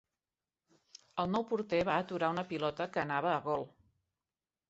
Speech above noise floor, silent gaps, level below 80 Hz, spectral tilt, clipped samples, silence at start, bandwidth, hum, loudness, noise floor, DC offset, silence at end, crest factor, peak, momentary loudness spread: over 56 dB; none; -70 dBFS; -4 dB/octave; under 0.1%; 1.15 s; 8 kHz; none; -35 LUFS; under -90 dBFS; under 0.1%; 1 s; 20 dB; -16 dBFS; 6 LU